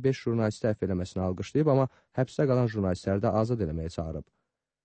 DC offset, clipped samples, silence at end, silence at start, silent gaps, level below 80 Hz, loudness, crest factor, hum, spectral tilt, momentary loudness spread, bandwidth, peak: under 0.1%; under 0.1%; 0.65 s; 0 s; none; -50 dBFS; -29 LUFS; 16 dB; none; -8 dB/octave; 9 LU; 8.8 kHz; -12 dBFS